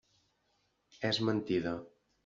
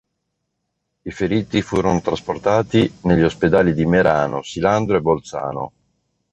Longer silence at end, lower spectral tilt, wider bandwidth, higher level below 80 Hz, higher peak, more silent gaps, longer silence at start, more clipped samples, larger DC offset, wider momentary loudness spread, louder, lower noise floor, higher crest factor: second, 0.35 s vs 0.65 s; second, -4 dB/octave vs -6.5 dB/octave; second, 7.4 kHz vs 8.4 kHz; second, -70 dBFS vs -42 dBFS; second, -18 dBFS vs -2 dBFS; neither; about the same, 1 s vs 1.05 s; neither; neither; second, 8 LU vs 11 LU; second, -34 LUFS vs -18 LUFS; about the same, -77 dBFS vs -75 dBFS; about the same, 20 dB vs 18 dB